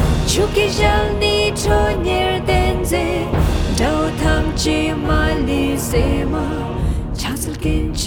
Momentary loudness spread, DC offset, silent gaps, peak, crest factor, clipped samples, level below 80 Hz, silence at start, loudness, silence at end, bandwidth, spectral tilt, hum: 6 LU; under 0.1%; none; 0 dBFS; 16 dB; under 0.1%; -22 dBFS; 0 s; -18 LUFS; 0 s; 19 kHz; -5 dB/octave; none